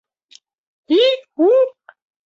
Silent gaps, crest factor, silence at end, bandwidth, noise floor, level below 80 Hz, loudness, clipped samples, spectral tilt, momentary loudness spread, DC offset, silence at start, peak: none; 14 dB; 0.55 s; 7.4 kHz; -51 dBFS; -74 dBFS; -16 LUFS; under 0.1%; -3 dB/octave; 4 LU; under 0.1%; 0.9 s; -4 dBFS